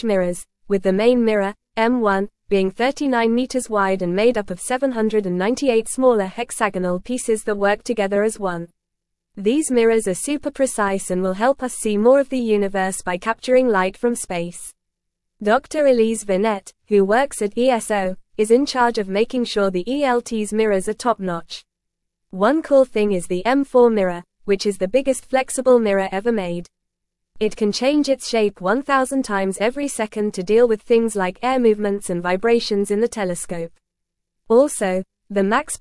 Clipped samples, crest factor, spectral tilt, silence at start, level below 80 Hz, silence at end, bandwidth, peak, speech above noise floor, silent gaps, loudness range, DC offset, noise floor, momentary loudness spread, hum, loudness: under 0.1%; 16 dB; -4.5 dB/octave; 0.05 s; -50 dBFS; 0.05 s; 12 kHz; -2 dBFS; 60 dB; none; 2 LU; under 0.1%; -78 dBFS; 8 LU; none; -19 LUFS